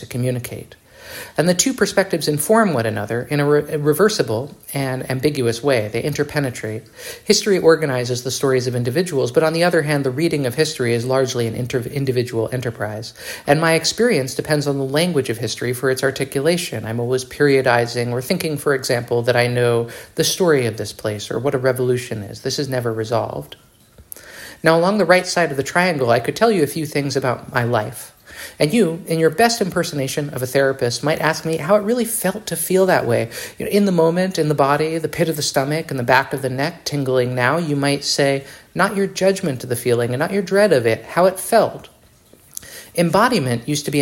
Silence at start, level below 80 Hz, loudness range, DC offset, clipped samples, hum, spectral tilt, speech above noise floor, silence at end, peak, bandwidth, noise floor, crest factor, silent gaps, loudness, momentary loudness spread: 0 s; -54 dBFS; 3 LU; under 0.1%; under 0.1%; none; -4.5 dB/octave; 32 dB; 0 s; 0 dBFS; 16.5 kHz; -50 dBFS; 18 dB; none; -18 LUFS; 10 LU